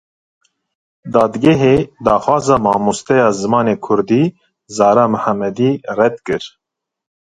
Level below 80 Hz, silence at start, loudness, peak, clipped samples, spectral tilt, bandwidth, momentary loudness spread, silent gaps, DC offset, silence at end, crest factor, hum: -48 dBFS; 1.05 s; -14 LUFS; 0 dBFS; under 0.1%; -6.5 dB/octave; 9.6 kHz; 7 LU; none; under 0.1%; 0.9 s; 16 dB; none